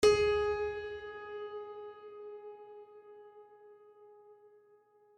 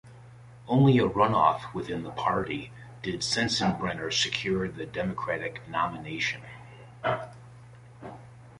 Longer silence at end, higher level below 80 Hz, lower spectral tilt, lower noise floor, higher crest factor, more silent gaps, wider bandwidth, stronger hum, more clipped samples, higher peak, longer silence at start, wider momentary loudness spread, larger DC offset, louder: first, 0.85 s vs 0.05 s; about the same, -60 dBFS vs -56 dBFS; second, -3.5 dB/octave vs -5 dB/octave; first, -65 dBFS vs -49 dBFS; about the same, 22 dB vs 20 dB; neither; about the same, 12.5 kHz vs 11.5 kHz; neither; neither; second, -14 dBFS vs -8 dBFS; about the same, 0 s vs 0.05 s; first, 28 LU vs 23 LU; neither; second, -35 LUFS vs -28 LUFS